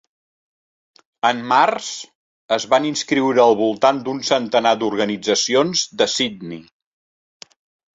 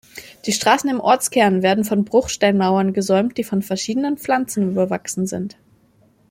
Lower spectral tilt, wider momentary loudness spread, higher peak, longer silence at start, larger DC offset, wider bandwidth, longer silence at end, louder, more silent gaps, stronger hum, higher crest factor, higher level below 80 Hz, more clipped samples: second, -3 dB/octave vs -4.5 dB/octave; about the same, 10 LU vs 8 LU; about the same, -2 dBFS vs 0 dBFS; first, 1.25 s vs 0.15 s; neither; second, 8.2 kHz vs 16.5 kHz; first, 1.35 s vs 0.8 s; about the same, -18 LUFS vs -19 LUFS; first, 2.15-2.49 s vs none; neither; about the same, 18 dB vs 18 dB; second, -64 dBFS vs -54 dBFS; neither